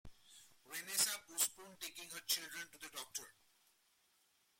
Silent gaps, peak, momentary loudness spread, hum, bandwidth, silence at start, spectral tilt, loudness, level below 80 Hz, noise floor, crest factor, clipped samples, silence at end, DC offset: none; -20 dBFS; 13 LU; none; 16.5 kHz; 0.05 s; 1.5 dB/octave; -41 LUFS; -76 dBFS; -77 dBFS; 26 dB; under 0.1%; 1.3 s; under 0.1%